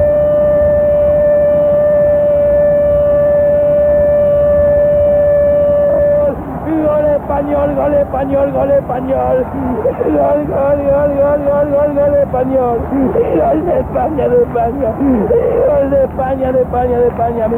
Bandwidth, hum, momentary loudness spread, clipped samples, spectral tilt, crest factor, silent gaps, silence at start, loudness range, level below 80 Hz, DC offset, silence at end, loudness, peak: 3.4 kHz; none; 5 LU; under 0.1%; -10 dB/octave; 10 dB; none; 0 s; 3 LU; -30 dBFS; under 0.1%; 0 s; -12 LUFS; -2 dBFS